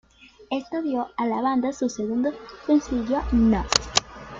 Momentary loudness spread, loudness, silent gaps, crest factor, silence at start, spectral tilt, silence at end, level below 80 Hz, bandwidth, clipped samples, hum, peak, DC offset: 8 LU; -24 LUFS; none; 24 dB; 0.4 s; -4 dB/octave; 0 s; -40 dBFS; 9 kHz; under 0.1%; none; 0 dBFS; under 0.1%